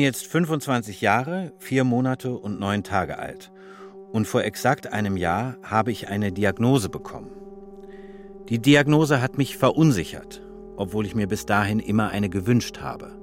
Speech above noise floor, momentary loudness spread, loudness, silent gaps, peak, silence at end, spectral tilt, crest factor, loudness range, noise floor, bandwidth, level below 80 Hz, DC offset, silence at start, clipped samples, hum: 20 dB; 23 LU; -23 LUFS; none; -4 dBFS; 0 s; -6 dB/octave; 20 dB; 4 LU; -43 dBFS; 16.5 kHz; -52 dBFS; under 0.1%; 0 s; under 0.1%; none